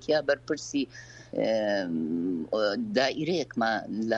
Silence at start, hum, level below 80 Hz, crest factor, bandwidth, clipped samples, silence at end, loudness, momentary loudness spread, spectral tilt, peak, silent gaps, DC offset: 0 s; none; -64 dBFS; 16 dB; 8.4 kHz; under 0.1%; 0 s; -29 LUFS; 6 LU; -4.5 dB/octave; -12 dBFS; none; under 0.1%